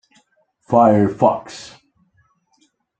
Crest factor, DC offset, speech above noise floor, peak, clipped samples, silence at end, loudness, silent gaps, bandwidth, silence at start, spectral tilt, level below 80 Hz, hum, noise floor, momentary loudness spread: 18 dB; under 0.1%; 47 dB; -2 dBFS; under 0.1%; 1.35 s; -16 LUFS; none; 9 kHz; 0.7 s; -7.5 dB/octave; -58 dBFS; none; -63 dBFS; 23 LU